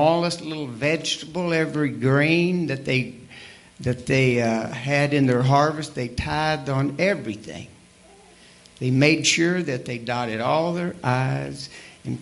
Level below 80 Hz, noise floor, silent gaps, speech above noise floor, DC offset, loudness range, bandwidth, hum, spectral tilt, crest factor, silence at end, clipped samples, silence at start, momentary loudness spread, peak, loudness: -52 dBFS; -51 dBFS; none; 29 dB; under 0.1%; 2 LU; 11.5 kHz; none; -5 dB/octave; 20 dB; 0 s; under 0.1%; 0 s; 15 LU; -2 dBFS; -22 LUFS